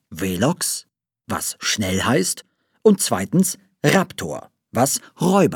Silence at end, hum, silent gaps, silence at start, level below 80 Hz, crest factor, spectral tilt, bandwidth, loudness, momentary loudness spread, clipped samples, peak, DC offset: 0 s; none; none; 0.1 s; -60 dBFS; 18 dB; -4 dB/octave; 19 kHz; -20 LUFS; 11 LU; under 0.1%; -2 dBFS; under 0.1%